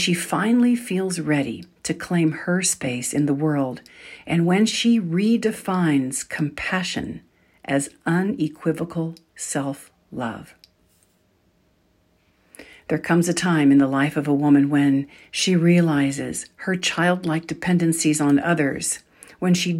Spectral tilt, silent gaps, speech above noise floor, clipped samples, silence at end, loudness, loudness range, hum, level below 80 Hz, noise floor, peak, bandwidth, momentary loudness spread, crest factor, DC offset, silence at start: -5 dB/octave; none; 42 dB; under 0.1%; 0 s; -21 LUFS; 10 LU; none; -60 dBFS; -63 dBFS; -6 dBFS; 16 kHz; 13 LU; 16 dB; under 0.1%; 0 s